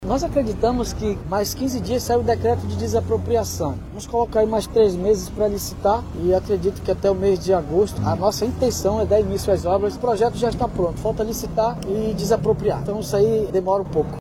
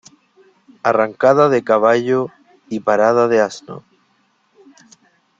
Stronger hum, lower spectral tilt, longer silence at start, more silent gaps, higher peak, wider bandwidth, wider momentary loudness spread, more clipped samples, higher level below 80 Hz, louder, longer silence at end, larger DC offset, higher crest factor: neither; about the same, -6 dB/octave vs -6 dB/octave; second, 0 s vs 0.85 s; neither; second, -6 dBFS vs -2 dBFS; first, 17 kHz vs 7.8 kHz; second, 5 LU vs 15 LU; neither; first, -36 dBFS vs -62 dBFS; second, -21 LUFS vs -15 LUFS; second, 0 s vs 1.6 s; neither; about the same, 14 dB vs 16 dB